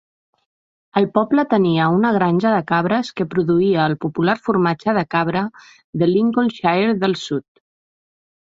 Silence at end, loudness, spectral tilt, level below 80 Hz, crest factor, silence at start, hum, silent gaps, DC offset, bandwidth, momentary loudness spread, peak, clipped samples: 1.05 s; -18 LUFS; -7.5 dB/octave; -58 dBFS; 16 dB; 0.95 s; none; 5.84-5.93 s; under 0.1%; 7.6 kHz; 7 LU; -2 dBFS; under 0.1%